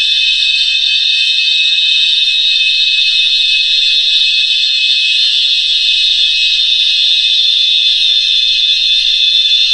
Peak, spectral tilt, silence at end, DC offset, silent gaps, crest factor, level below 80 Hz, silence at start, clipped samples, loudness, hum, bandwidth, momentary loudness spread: 0 dBFS; 6.5 dB/octave; 0 s; 0.4%; none; 10 dB; -46 dBFS; 0 s; under 0.1%; -7 LUFS; none; 11 kHz; 1 LU